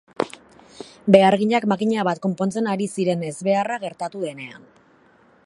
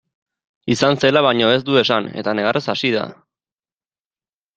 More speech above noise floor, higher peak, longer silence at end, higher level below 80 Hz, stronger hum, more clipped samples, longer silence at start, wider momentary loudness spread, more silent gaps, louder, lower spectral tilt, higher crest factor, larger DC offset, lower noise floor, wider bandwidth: second, 35 dB vs over 73 dB; about the same, 0 dBFS vs 0 dBFS; second, 0.9 s vs 1.45 s; second, -66 dBFS vs -58 dBFS; neither; neither; second, 0.2 s vs 0.65 s; first, 15 LU vs 8 LU; neither; second, -21 LUFS vs -17 LUFS; about the same, -6 dB/octave vs -5 dB/octave; about the same, 22 dB vs 18 dB; neither; second, -55 dBFS vs under -90 dBFS; first, 11.5 kHz vs 9 kHz